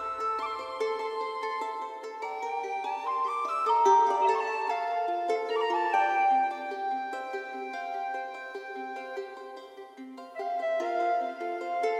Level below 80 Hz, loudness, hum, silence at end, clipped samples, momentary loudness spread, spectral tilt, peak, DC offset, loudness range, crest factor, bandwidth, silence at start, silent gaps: -80 dBFS; -30 LUFS; none; 0 s; under 0.1%; 14 LU; -2 dB/octave; -12 dBFS; under 0.1%; 10 LU; 18 dB; 12 kHz; 0 s; none